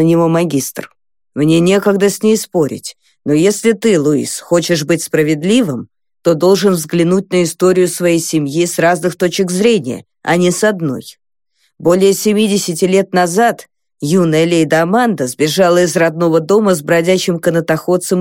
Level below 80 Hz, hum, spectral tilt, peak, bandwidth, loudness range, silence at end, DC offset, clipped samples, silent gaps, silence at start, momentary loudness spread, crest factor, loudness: -58 dBFS; none; -5 dB/octave; 0 dBFS; 17 kHz; 2 LU; 0 s; 0.2%; under 0.1%; none; 0 s; 8 LU; 12 dB; -13 LUFS